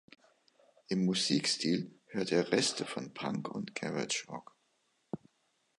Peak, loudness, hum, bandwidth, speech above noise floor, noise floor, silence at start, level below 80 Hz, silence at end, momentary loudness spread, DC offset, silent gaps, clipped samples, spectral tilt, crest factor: -14 dBFS; -33 LUFS; none; 11.5 kHz; 43 dB; -76 dBFS; 0.9 s; -76 dBFS; 0.6 s; 17 LU; under 0.1%; none; under 0.1%; -4 dB/octave; 22 dB